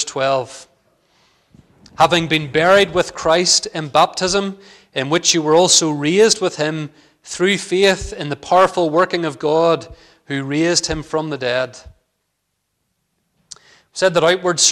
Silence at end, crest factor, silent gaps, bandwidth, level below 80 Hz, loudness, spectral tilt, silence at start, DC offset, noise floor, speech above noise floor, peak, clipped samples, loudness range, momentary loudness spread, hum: 0 s; 16 dB; none; 16 kHz; -46 dBFS; -16 LUFS; -3 dB/octave; 0 s; under 0.1%; -72 dBFS; 56 dB; -2 dBFS; under 0.1%; 7 LU; 13 LU; none